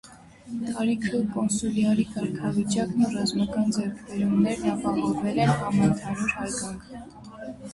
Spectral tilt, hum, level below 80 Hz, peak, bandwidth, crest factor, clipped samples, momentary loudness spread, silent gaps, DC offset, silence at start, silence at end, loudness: -5.5 dB/octave; none; -52 dBFS; -10 dBFS; 11.5 kHz; 16 dB; under 0.1%; 14 LU; none; under 0.1%; 0.05 s; 0 s; -26 LUFS